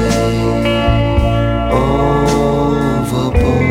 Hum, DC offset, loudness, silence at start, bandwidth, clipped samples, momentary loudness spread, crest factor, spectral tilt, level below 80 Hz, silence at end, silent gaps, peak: none; under 0.1%; -14 LUFS; 0 s; 16 kHz; under 0.1%; 2 LU; 12 dB; -6.5 dB/octave; -22 dBFS; 0 s; none; -2 dBFS